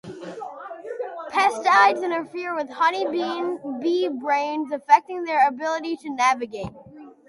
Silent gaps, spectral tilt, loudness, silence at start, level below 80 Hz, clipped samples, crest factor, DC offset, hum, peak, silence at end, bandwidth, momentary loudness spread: none; -3.5 dB/octave; -22 LUFS; 0.05 s; -62 dBFS; under 0.1%; 20 dB; under 0.1%; none; -2 dBFS; 0.2 s; 11.5 kHz; 17 LU